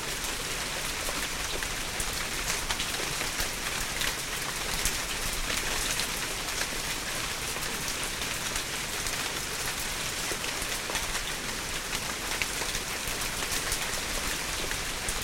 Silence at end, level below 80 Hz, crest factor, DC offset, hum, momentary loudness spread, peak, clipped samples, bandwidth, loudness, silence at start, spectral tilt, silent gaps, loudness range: 0 s; -42 dBFS; 22 dB; under 0.1%; none; 2 LU; -10 dBFS; under 0.1%; 16.5 kHz; -30 LUFS; 0 s; -1 dB/octave; none; 1 LU